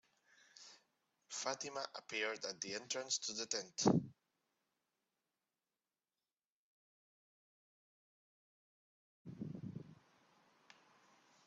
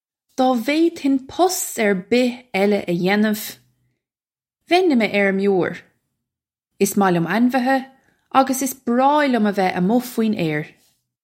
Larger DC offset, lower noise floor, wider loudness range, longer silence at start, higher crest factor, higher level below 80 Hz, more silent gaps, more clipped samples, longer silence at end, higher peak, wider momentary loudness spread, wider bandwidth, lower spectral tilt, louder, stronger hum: neither; about the same, under -90 dBFS vs under -90 dBFS; first, 16 LU vs 2 LU; first, 0.55 s vs 0.4 s; first, 28 dB vs 18 dB; second, -84 dBFS vs -66 dBFS; first, 6.46-9.25 s vs none; neither; first, 1.5 s vs 0.55 s; second, -18 dBFS vs 0 dBFS; first, 23 LU vs 6 LU; second, 8.2 kHz vs 16.5 kHz; second, -3.5 dB/octave vs -5 dB/octave; second, -41 LUFS vs -19 LUFS; neither